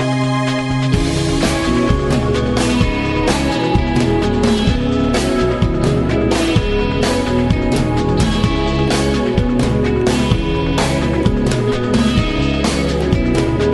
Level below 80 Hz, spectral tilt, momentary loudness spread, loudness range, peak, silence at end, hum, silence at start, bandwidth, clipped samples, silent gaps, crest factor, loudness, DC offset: -24 dBFS; -6 dB/octave; 2 LU; 0 LU; 0 dBFS; 0 s; none; 0 s; 12 kHz; under 0.1%; none; 14 dB; -16 LUFS; under 0.1%